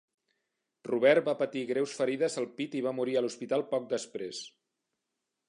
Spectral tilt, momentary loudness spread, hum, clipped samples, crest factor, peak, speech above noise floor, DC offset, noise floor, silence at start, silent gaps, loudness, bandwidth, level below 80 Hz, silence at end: -4.5 dB/octave; 14 LU; none; under 0.1%; 22 dB; -10 dBFS; 55 dB; under 0.1%; -85 dBFS; 0.85 s; none; -31 LUFS; 11 kHz; -84 dBFS; 1 s